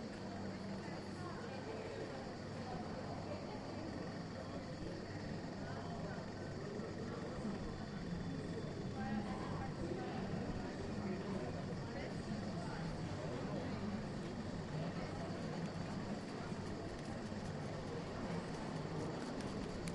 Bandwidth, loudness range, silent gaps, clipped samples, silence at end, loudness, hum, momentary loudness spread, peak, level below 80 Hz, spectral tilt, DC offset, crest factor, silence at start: 11.5 kHz; 3 LU; none; under 0.1%; 0 s; -45 LUFS; none; 3 LU; -26 dBFS; -60 dBFS; -6.5 dB/octave; under 0.1%; 18 dB; 0 s